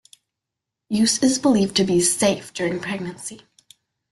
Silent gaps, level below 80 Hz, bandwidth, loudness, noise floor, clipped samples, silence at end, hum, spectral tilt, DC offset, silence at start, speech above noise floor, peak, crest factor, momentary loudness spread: none; -58 dBFS; 12.5 kHz; -20 LUFS; -84 dBFS; under 0.1%; 0.75 s; none; -3.5 dB/octave; under 0.1%; 0.9 s; 64 dB; -4 dBFS; 18 dB; 12 LU